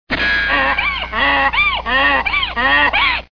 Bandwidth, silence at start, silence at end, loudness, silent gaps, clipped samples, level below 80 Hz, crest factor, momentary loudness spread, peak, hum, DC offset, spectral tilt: 5.4 kHz; 0.1 s; 0.15 s; -14 LUFS; none; under 0.1%; -32 dBFS; 12 dB; 4 LU; -4 dBFS; 60 Hz at -35 dBFS; 0.6%; -4.5 dB/octave